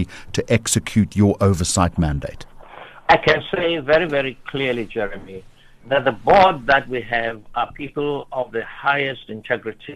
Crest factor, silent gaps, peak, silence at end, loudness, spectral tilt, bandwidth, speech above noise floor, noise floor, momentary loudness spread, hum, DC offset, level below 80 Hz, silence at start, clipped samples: 18 dB; none; -2 dBFS; 0 s; -19 LUFS; -4.5 dB/octave; 13 kHz; 20 dB; -40 dBFS; 12 LU; none; under 0.1%; -40 dBFS; 0 s; under 0.1%